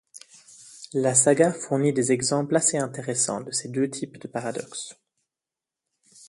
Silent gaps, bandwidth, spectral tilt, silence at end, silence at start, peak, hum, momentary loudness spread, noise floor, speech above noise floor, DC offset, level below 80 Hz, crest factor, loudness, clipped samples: none; 11.5 kHz; -4 dB/octave; 1.35 s; 0.15 s; -4 dBFS; none; 15 LU; -89 dBFS; 65 dB; under 0.1%; -68 dBFS; 22 dB; -24 LUFS; under 0.1%